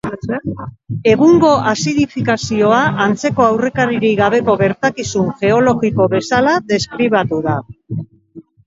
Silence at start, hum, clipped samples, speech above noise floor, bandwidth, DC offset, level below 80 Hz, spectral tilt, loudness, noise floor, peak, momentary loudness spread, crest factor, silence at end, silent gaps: 0.05 s; none; under 0.1%; 26 dB; 7.8 kHz; under 0.1%; -46 dBFS; -5.5 dB/octave; -14 LUFS; -40 dBFS; 0 dBFS; 11 LU; 14 dB; 0.25 s; none